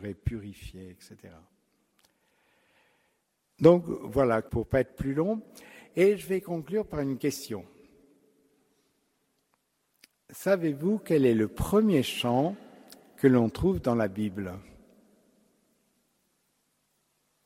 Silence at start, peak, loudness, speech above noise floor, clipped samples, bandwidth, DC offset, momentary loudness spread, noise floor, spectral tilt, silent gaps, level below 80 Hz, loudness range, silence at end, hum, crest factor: 0 s; -6 dBFS; -27 LUFS; 48 dB; under 0.1%; 16 kHz; under 0.1%; 18 LU; -75 dBFS; -6.5 dB/octave; none; -50 dBFS; 12 LU; 2.85 s; none; 24 dB